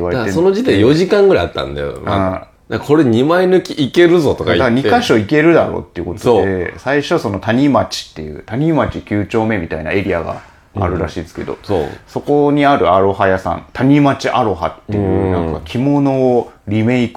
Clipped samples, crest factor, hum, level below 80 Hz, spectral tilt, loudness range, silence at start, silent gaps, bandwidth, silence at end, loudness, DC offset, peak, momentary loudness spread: under 0.1%; 14 dB; none; -38 dBFS; -6.5 dB/octave; 6 LU; 0 s; none; 14 kHz; 0.05 s; -14 LUFS; under 0.1%; 0 dBFS; 12 LU